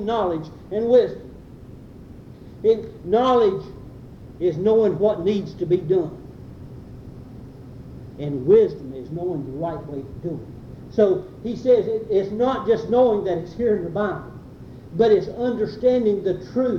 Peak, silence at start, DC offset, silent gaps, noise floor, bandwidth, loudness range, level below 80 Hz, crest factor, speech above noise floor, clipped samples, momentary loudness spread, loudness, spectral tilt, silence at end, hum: -4 dBFS; 0 s; under 0.1%; none; -41 dBFS; 6.8 kHz; 4 LU; -48 dBFS; 18 dB; 21 dB; under 0.1%; 23 LU; -21 LUFS; -8 dB/octave; 0 s; none